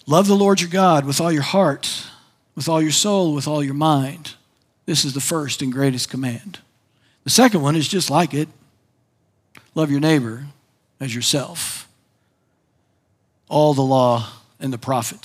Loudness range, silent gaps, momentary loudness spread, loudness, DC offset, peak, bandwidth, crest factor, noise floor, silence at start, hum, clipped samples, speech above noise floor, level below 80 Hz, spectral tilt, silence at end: 5 LU; none; 16 LU; -19 LUFS; under 0.1%; 0 dBFS; 16 kHz; 20 dB; -65 dBFS; 0.05 s; none; under 0.1%; 47 dB; -68 dBFS; -4.5 dB/octave; 0.1 s